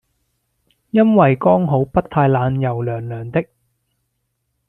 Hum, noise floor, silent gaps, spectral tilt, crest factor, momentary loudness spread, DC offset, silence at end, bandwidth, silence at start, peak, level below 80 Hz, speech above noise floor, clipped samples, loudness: none; -71 dBFS; none; -10.5 dB/octave; 16 dB; 11 LU; under 0.1%; 1.25 s; 4 kHz; 0.95 s; -2 dBFS; -48 dBFS; 56 dB; under 0.1%; -17 LUFS